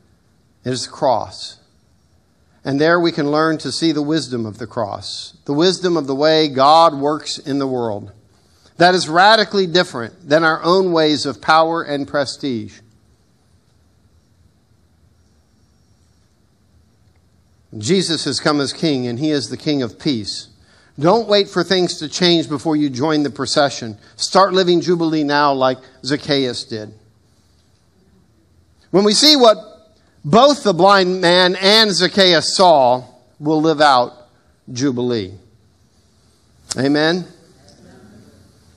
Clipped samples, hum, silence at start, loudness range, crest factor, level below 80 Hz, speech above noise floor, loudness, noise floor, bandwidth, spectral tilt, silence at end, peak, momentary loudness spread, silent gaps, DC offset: under 0.1%; none; 0.65 s; 10 LU; 18 dB; -60 dBFS; 41 dB; -15 LUFS; -57 dBFS; 14.5 kHz; -4 dB/octave; 1.5 s; 0 dBFS; 15 LU; none; under 0.1%